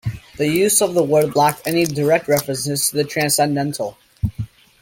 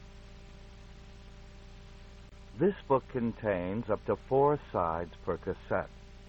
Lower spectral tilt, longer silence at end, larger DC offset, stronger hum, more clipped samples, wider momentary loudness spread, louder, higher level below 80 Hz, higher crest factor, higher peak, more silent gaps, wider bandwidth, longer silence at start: second, -4 dB/octave vs -8.5 dB/octave; first, 0.35 s vs 0 s; neither; second, none vs 60 Hz at -55 dBFS; neither; second, 12 LU vs 25 LU; first, -18 LUFS vs -32 LUFS; first, -44 dBFS vs -52 dBFS; about the same, 16 dB vs 20 dB; first, -2 dBFS vs -14 dBFS; neither; first, 17 kHz vs 8 kHz; about the same, 0.05 s vs 0 s